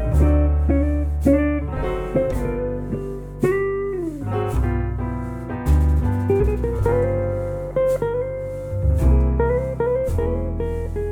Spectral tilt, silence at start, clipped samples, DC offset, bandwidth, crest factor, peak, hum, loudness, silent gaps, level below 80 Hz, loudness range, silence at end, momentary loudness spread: -9 dB/octave; 0 s; under 0.1%; under 0.1%; 12 kHz; 14 dB; -6 dBFS; none; -22 LUFS; none; -24 dBFS; 3 LU; 0 s; 9 LU